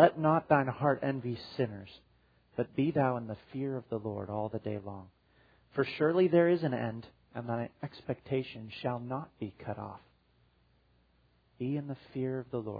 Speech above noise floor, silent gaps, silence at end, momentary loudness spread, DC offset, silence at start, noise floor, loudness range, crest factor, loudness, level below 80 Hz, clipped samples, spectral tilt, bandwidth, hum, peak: 37 dB; none; 0 s; 16 LU; under 0.1%; 0 s; -69 dBFS; 9 LU; 24 dB; -33 LUFS; -68 dBFS; under 0.1%; -6.5 dB/octave; 5 kHz; none; -8 dBFS